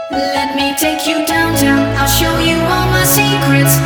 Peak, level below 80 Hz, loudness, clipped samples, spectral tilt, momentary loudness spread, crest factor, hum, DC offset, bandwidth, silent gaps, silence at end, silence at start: 0 dBFS; -28 dBFS; -12 LUFS; under 0.1%; -4 dB/octave; 5 LU; 12 dB; none; under 0.1%; over 20 kHz; none; 0 s; 0 s